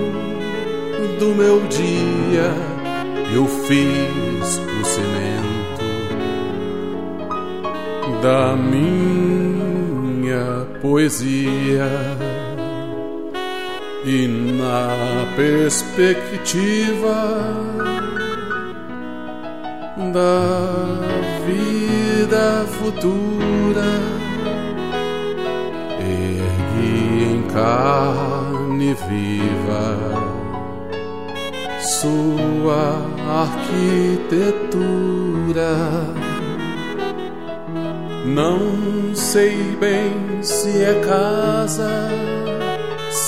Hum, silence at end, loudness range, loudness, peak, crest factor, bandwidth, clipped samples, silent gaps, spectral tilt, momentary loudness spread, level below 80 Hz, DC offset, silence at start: none; 0 s; 4 LU; -19 LUFS; -4 dBFS; 16 dB; 16 kHz; under 0.1%; none; -5.5 dB/octave; 10 LU; -46 dBFS; 2%; 0 s